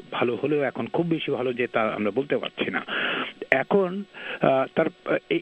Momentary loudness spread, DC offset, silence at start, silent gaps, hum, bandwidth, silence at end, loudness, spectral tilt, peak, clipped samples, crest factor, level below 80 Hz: 6 LU; under 0.1%; 0 s; none; none; 8.2 kHz; 0 s; -25 LUFS; -7.5 dB/octave; 0 dBFS; under 0.1%; 24 dB; -68 dBFS